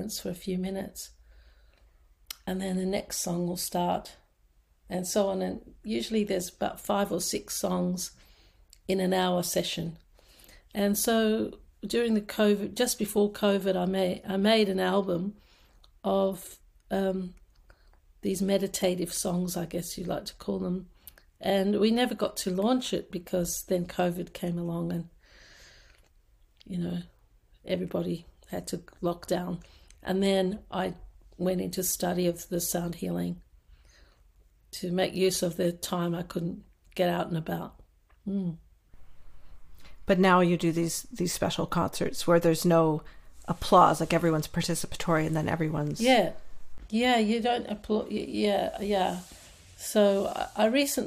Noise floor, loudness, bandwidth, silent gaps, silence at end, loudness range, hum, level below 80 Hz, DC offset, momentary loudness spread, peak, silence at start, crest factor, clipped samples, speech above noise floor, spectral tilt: -65 dBFS; -29 LUFS; 15.5 kHz; none; 0 s; 9 LU; none; -54 dBFS; under 0.1%; 13 LU; -8 dBFS; 0 s; 22 dB; under 0.1%; 37 dB; -5 dB/octave